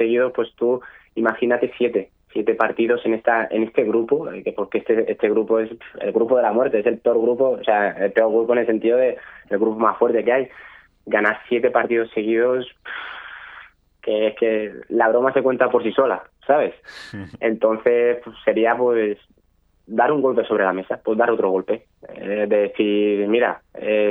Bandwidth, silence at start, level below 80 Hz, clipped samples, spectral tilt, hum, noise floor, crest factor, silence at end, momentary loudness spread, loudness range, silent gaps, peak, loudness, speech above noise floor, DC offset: 5 kHz; 0 s; -62 dBFS; under 0.1%; -7.5 dB/octave; none; -61 dBFS; 18 dB; 0 s; 10 LU; 3 LU; none; -2 dBFS; -20 LUFS; 41 dB; under 0.1%